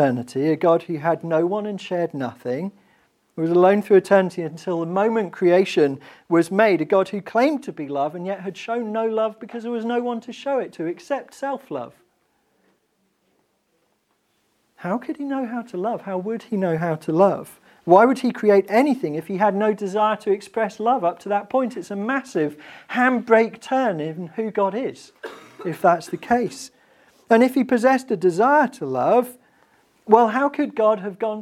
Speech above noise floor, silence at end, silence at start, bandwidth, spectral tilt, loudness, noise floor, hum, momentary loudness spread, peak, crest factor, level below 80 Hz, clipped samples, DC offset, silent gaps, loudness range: 48 dB; 0 s; 0 s; 15 kHz; -6.5 dB/octave; -21 LUFS; -68 dBFS; none; 13 LU; 0 dBFS; 22 dB; -68 dBFS; under 0.1%; under 0.1%; none; 11 LU